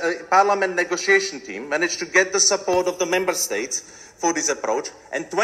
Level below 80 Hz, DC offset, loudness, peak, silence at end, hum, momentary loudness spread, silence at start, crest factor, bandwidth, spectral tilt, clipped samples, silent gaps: -62 dBFS; under 0.1%; -20 LUFS; -2 dBFS; 0 s; none; 10 LU; 0 s; 20 dB; 14.5 kHz; -1 dB/octave; under 0.1%; none